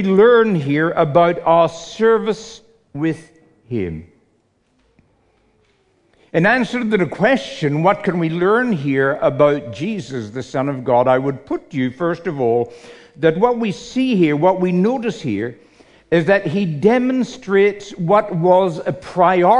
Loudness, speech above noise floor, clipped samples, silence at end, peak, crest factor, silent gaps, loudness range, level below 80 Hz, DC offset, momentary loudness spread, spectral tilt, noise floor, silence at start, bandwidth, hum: -17 LUFS; 45 dB; under 0.1%; 0 s; -2 dBFS; 16 dB; none; 6 LU; -54 dBFS; under 0.1%; 10 LU; -7 dB/octave; -62 dBFS; 0 s; 10.5 kHz; none